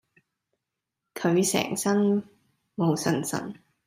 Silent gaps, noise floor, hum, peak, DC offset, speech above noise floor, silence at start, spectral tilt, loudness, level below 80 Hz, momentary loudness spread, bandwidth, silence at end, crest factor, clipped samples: none; -85 dBFS; none; -10 dBFS; under 0.1%; 60 dB; 1.15 s; -5 dB/octave; -26 LUFS; -70 dBFS; 15 LU; 16 kHz; 0.3 s; 18 dB; under 0.1%